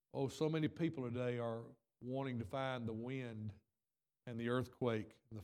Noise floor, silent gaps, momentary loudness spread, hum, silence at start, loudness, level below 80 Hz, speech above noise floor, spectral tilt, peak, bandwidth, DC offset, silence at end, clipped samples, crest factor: under -90 dBFS; none; 12 LU; none; 0.15 s; -42 LUFS; -78 dBFS; over 48 dB; -7 dB/octave; -24 dBFS; 14.5 kHz; under 0.1%; 0 s; under 0.1%; 18 dB